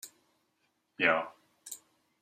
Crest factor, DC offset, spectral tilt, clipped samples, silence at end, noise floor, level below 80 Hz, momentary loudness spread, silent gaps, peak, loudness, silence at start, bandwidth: 26 dB; under 0.1%; -2.5 dB/octave; under 0.1%; 0.45 s; -77 dBFS; -82 dBFS; 22 LU; none; -12 dBFS; -29 LUFS; 0.05 s; 16 kHz